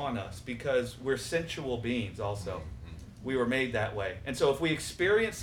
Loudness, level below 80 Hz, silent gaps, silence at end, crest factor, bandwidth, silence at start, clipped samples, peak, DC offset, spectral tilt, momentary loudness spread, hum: -32 LUFS; -52 dBFS; none; 0 s; 18 dB; 18 kHz; 0 s; under 0.1%; -14 dBFS; under 0.1%; -5 dB/octave; 12 LU; none